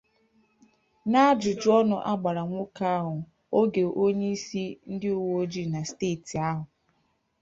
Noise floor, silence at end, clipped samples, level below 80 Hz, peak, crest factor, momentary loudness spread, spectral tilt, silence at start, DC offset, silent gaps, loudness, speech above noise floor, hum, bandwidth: -72 dBFS; 0.75 s; under 0.1%; -64 dBFS; -8 dBFS; 20 dB; 12 LU; -6 dB/octave; 1.05 s; under 0.1%; none; -27 LUFS; 46 dB; none; 7.8 kHz